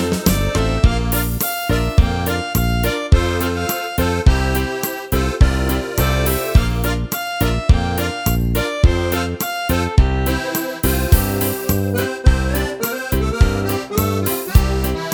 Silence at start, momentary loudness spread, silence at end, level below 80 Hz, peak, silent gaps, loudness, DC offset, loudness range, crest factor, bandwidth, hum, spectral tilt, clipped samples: 0 s; 5 LU; 0 s; -20 dBFS; 0 dBFS; none; -18 LUFS; under 0.1%; 1 LU; 16 dB; over 20 kHz; none; -5.5 dB/octave; under 0.1%